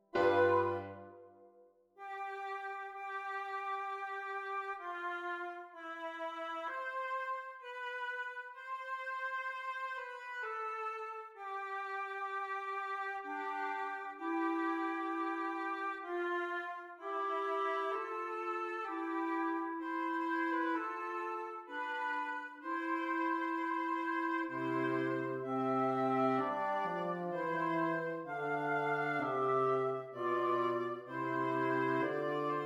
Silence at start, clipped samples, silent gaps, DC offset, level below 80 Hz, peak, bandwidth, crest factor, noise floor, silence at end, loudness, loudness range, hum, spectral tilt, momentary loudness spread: 0.15 s; under 0.1%; none; under 0.1%; -84 dBFS; -18 dBFS; 10.5 kHz; 18 dB; -65 dBFS; 0 s; -37 LUFS; 6 LU; none; -6.5 dB/octave; 9 LU